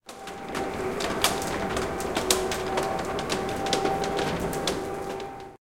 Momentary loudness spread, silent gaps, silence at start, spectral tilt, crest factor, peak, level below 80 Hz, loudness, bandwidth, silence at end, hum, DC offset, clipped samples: 10 LU; none; 0 s; -3 dB/octave; 26 dB; -2 dBFS; -46 dBFS; -28 LUFS; 17 kHz; 0.15 s; none; 0.2%; under 0.1%